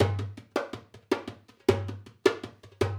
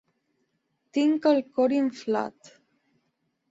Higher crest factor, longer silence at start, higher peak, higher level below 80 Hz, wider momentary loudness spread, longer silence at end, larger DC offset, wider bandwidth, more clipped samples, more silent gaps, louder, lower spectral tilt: first, 24 dB vs 18 dB; second, 0 s vs 0.95 s; first, -6 dBFS vs -10 dBFS; first, -58 dBFS vs -76 dBFS; first, 15 LU vs 8 LU; second, 0 s vs 1.2 s; neither; first, 16.5 kHz vs 7.8 kHz; neither; neither; second, -31 LUFS vs -25 LUFS; about the same, -6.5 dB/octave vs -5.5 dB/octave